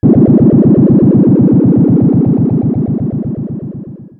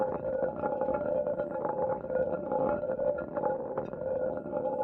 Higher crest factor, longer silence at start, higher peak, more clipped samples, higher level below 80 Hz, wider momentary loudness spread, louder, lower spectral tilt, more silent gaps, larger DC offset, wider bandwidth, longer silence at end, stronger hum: second, 8 dB vs 14 dB; about the same, 0.05 s vs 0 s; first, 0 dBFS vs -18 dBFS; neither; first, -36 dBFS vs -60 dBFS; first, 14 LU vs 3 LU; first, -9 LUFS vs -32 LUFS; first, -15.5 dB/octave vs -11 dB/octave; neither; neither; second, 2.3 kHz vs 3.3 kHz; first, 0.15 s vs 0 s; neither